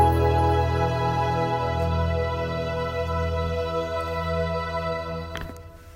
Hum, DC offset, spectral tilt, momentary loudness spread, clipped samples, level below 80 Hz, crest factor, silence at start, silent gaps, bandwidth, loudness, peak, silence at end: none; under 0.1%; -7 dB/octave; 10 LU; under 0.1%; -38 dBFS; 18 dB; 0 s; none; 15.5 kHz; -25 LUFS; -6 dBFS; 0 s